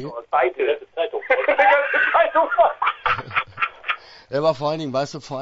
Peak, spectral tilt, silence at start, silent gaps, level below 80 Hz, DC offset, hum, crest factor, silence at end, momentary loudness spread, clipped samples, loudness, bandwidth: -2 dBFS; -5 dB/octave; 0 s; none; -56 dBFS; under 0.1%; none; 18 dB; 0 s; 10 LU; under 0.1%; -20 LUFS; 8 kHz